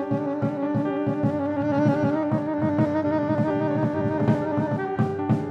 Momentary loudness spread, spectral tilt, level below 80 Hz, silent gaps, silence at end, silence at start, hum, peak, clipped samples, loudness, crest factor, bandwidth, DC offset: 3 LU; -9.5 dB/octave; -60 dBFS; none; 0 s; 0 s; none; -8 dBFS; under 0.1%; -24 LUFS; 16 dB; 7 kHz; under 0.1%